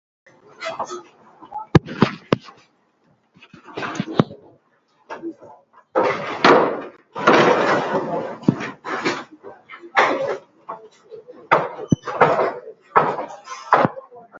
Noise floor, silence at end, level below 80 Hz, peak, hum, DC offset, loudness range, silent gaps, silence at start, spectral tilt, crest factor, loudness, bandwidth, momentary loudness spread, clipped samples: -62 dBFS; 0 s; -50 dBFS; 0 dBFS; none; under 0.1%; 8 LU; none; 0.6 s; -6 dB/octave; 22 dB; -20 LUFS; 7.8 kHz; 21 LU; under 0.1%